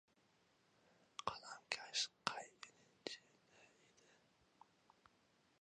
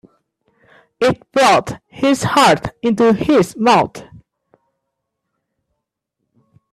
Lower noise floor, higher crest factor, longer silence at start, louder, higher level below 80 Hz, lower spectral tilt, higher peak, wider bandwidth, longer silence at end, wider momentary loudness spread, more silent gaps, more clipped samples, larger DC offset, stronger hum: about the same, -77 dBFS vs -76 dBFS; first, 36 dB vs 16 dB; first, 1.2 s vs 1 s; second, -47 LUFS vs -14 LUFS; second, -86 dBFS vs -50 dBFS; second, -0.5 dB/octave vs -4.5 dB/octave; second, -16 dBFS vs 0 dBFS; second, 9.6 kHz vs 14 kHz; second, 1.95 s vs 2.7 s; first, 16 LU vs 7 LU; neither; neither; neither; neither